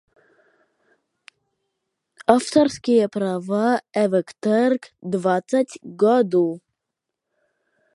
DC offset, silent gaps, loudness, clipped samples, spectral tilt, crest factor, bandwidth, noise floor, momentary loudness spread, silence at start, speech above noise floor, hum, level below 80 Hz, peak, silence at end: under 0.1%; none; -20 LUFS; under 0.1%; -6 dB/octave; 22 dB; 11.5 kHz; -83 dBFS; 8 LU; 2.3 s; 63 dB; none; -66 dBFS; 0 dBFS; 1.35 s